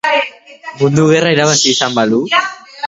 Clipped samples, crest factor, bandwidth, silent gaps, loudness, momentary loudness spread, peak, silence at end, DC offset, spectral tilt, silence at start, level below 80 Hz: under 0.1%; 14 dB; 8 kHz; none; -12 LUFS; 14 LU; 0 dBFS; 0 s; under 0.1%; -3.5 dB/octave; 0.05 s; -56 dBFS